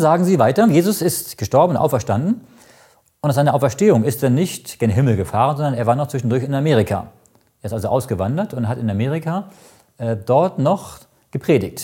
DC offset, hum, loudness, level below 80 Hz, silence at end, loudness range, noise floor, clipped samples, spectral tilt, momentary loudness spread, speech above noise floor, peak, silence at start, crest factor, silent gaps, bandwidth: under 0.1%; none; -18 LUFS; -52 dBFS; 0 s; 4 LU; -53 dBFS; under 0.1%; -6.5 dB/octave; 11 LU; 35 dB; -2 dBFS; 0 s; 16 dB; none; 17 kHz